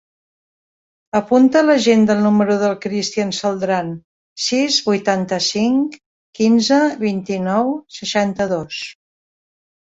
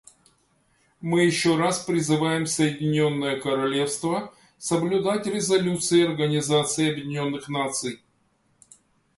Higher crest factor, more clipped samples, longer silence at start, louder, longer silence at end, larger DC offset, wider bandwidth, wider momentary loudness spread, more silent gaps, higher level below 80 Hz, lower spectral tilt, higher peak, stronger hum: about the same, 16 dB vs 16 dB; neither; first, 1.15 s vs 1 s; first, -17 LUFS vs -24 LUFS; second, 0.9 s vs 1.2 s; neither; second, 8 kHz vs 11.5 kHz; about the same, 10 LU vs 8 LU; first, 4.04-4.36 s, 6.06-6.33 s vs none; first, -58 dBFS vs -64 dBFS; about the same, -4.5 dB/octave vs -4.5 dB/octave; first, -2 dBFS vs -8 dBFS; neither